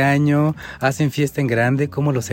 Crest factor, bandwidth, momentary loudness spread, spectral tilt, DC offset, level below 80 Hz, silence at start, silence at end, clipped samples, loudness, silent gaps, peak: 14 dB; 16.5 kHz; 6 LU; -6.5 dB/octave; under 0.1%; -52 dBFS; 0 s; 0 s; under 0.1%; -19 LUFS; none; -4 dBFS